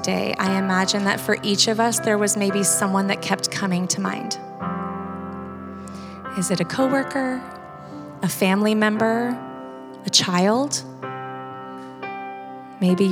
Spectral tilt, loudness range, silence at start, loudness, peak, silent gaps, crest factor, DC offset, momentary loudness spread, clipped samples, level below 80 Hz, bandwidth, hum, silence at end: -3.5 dB/octave; 6 LU; 0 s; -21 LUFS; -4 dBFS; none; 20 dB; under 0.1%; 17 LU; under 0.1%; -62 dBFS; over 20 kHz; none; 0 s